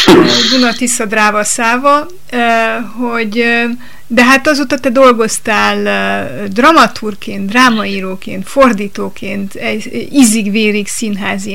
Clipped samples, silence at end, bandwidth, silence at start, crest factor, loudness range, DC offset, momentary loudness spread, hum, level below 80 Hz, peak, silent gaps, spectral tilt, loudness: 0.6%; 0 s; 17 kHz; 0 s; 12 dB; 3 LU; 6%; 13 LU; none; -44 dBFS; 0 dBFS; none; -3.5 dB/octave; -11 LUFS